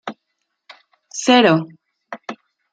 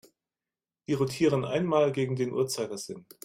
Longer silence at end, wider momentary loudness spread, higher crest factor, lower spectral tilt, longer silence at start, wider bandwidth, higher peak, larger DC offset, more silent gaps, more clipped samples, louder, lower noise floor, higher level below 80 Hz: first, 0.4 s vs 0.2 s; first, 23 LU vs 12 LU; about the same, 20 dB vs 16 dB; second, -4 dB/octave vs -5.5 dB/octave; second, 0.05 s vs 0.9 s; second, 9.2 kHz vs 16 kHz; first, -2 dBFS vs -12 dBFS; neither; neither; neither; first, -15 LUFS vs -28 LUFS; second, -75 dBFS vs under -90 dBFS; about the same, -68 dBFS vs -66 dBFS